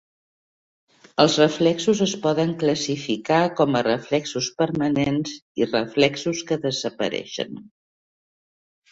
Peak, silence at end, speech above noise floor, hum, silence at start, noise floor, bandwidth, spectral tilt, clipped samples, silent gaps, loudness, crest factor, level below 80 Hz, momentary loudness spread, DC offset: -2 dBFS; 1.3 s; over 68 dB; none; 1.2 s; under -90 dBFS; 8 kHz; -4.5 dB/octave; under 0.1%; 5.42-5.55 s; -22 LUFS; 20 dB; -60 dBFS; 9 LU; under 0.1%